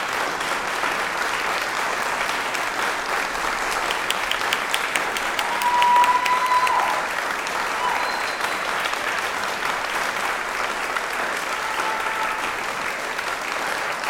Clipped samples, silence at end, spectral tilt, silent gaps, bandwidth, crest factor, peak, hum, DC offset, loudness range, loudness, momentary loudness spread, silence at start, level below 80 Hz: under 0.1%; 0 s; -1 dB/octave; none; 17.5 kHz; 22 dB; -2 dBFS; none; under 0.1%; 4 LU; -22 LUFS; 6 LU; 0 s; -52 dBFS